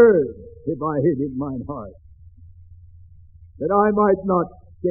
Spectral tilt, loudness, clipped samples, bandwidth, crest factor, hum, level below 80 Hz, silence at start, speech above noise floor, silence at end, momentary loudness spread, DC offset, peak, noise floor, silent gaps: -4.5 dB/octave; -21 LUFS; under 0.1%; 2.5 kHz; 18 dB; none; -48 dBFS; 0 s; 27 dB; 0 s; 15 LU; under 0.1%; -2 dBFS; -46 dBFS; none